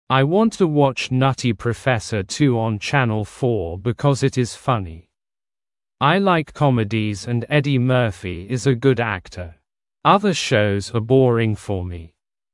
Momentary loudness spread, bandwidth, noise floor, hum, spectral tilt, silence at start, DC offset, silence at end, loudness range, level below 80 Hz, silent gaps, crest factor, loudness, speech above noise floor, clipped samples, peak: 9 LU; 11.5 kHz; under -90 dBFS; none; -6 dB/octave; 0.1 s; under 0.1%; 0.45 s; 2 LU; -50 dBFS; none; 18 dB; -19 LUFS; over 71 dB; under 0.1%; -2 dBFS